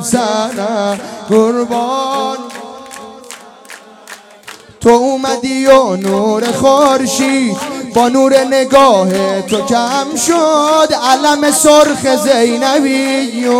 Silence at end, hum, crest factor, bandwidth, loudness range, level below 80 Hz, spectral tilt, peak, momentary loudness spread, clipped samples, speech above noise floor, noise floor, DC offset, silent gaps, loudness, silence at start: 0 s; none; 12 dB; 16.5 kHz; 7 LU; -50 dBFS; -3.5 dB/octave; 0 dBFS; 14 LU; 0.9%; 24 dB; -35 dBFS; under 0.1%; none; -11 LUFS; 0 s